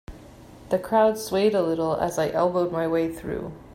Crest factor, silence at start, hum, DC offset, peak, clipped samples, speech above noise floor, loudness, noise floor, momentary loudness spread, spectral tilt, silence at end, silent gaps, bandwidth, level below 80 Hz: 16 dB; 0.1 s; none; under 0.1%; -8 dBFS; under 0.1%; 22 dB; -24 LUFS; -46 dBFS; 8 LU; -5.5 dB/octave; 0 s; none; 16 kHz; -50 dBFS